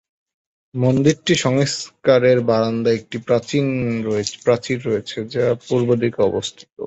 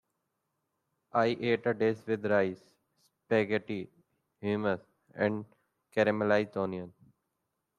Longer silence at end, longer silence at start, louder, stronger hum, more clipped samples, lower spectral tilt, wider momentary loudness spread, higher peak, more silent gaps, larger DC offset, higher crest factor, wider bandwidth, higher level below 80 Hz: second, 0 s vs 0.9 s; second, 0.75 s vs 1.15 s; first, -19 LUFS vs -31 LUFS; neither; neither; second, -5.5 dB/octave vs -7.5 dB/octave; second, 8 LU vs 12 LU; first, -2 dBFS vs -12 dBFS; first, 6.72-6.76 s vs none; neither; about the same, 18 dB vs 20 dB; second, 8.2 kHz vs 10.5 kHz; first, -54 dBFS vs -74 dBFS